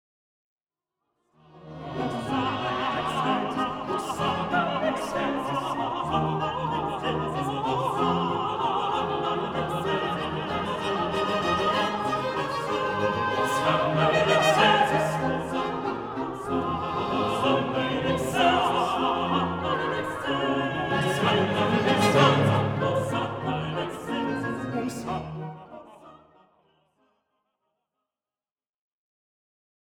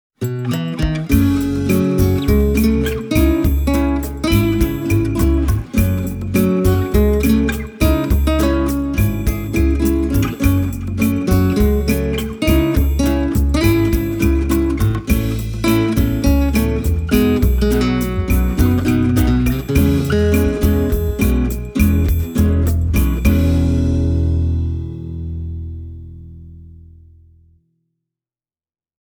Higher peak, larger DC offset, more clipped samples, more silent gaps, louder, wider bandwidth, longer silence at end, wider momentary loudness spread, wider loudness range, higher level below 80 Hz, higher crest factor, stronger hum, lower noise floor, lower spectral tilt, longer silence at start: second, -6 dBFS vs 0 dBFS; neither; neither; neither; second, -26 LUFS vs -16 LUFS; about the same, 18.5 kHz vs over 20 kHz; first, 3.85 s vs 2.25 s; first, 9 LU vs 6 LU; first, 8 LU vs 3 LU; second, -54 dBFS vs -20 dBFS; about the same, 20 dB vs 16 dB; neither; about the same, under -90 dBFS vs under -90 dBFS; second, -5.5 dB/octave vs -7 dB/octave; first, 1.55 s vs 0.2 s